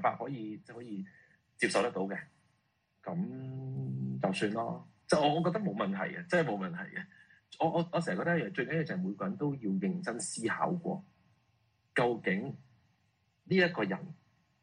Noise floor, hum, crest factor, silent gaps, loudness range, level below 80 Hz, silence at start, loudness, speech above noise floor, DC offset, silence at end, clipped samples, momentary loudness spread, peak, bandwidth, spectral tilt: -76 dBFS; none; 22 dB; none; 4 LU; -74 dBFS; 0 s; -34 LUFS; 43 dB; under 0.1%; 0.5 s; under 0.1%; 14 LU; -14 dBFS; 10.5 kHz; -5.5 dB/octave